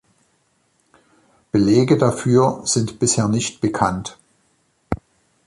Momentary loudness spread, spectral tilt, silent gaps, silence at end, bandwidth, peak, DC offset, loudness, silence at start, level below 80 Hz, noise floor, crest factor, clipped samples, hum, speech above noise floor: 14 LU; -5 dB/octave; none; 0.5 s; 11.5 kHz; -2 dBFS; under 0.1%; -19 LUFS; 1.55 s; -46 dBFS; -64 dBFS; 18 dB; under 0.1%; none; 47 dB